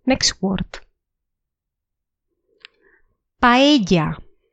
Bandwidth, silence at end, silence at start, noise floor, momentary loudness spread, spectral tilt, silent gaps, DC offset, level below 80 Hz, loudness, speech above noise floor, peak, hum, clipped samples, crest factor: 9.2 kHz; 0.3 s; 0.05 s; -82 dBFS; 15 LU; -4 dB/octave; none; under 0.1%; -42 dBFS; -17 LUFS; 65 dB; -2 dBFS; none; under 0.1%; 20 dB